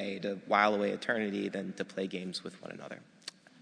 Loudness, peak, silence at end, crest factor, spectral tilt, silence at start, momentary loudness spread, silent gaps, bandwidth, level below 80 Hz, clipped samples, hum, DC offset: -33 LUFS; -10 dBFS; 0.3 s; 24 dB; -5 dB/octave; 0 s; 19 LU; none; 10.5 kHz; -82 dBFS; under 0.1%; none; under 0.1%